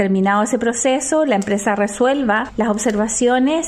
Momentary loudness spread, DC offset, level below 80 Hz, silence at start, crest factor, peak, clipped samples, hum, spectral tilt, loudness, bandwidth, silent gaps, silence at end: 3 LU; under 0.1%; -48 dBFS; 0 s; 12 dB; -4 dBFS; under 0.1%; none; -4 dB/octave; -17 LUFS; 13.5 kHz; none; 0 s